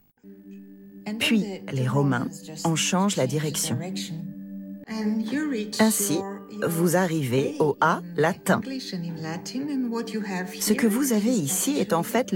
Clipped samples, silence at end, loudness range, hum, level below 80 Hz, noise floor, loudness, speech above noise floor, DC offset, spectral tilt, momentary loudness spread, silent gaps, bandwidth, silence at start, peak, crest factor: under 0.1%; 0 s; 3 LU; none; -68 dBFS; -48 dBFS; -25 LUFS; 24 dB; under 0.1%; -4.5 dB/octave; 13 LU; none; 17.5 kHz; 0.25 s; -6 dBFS; 18 dB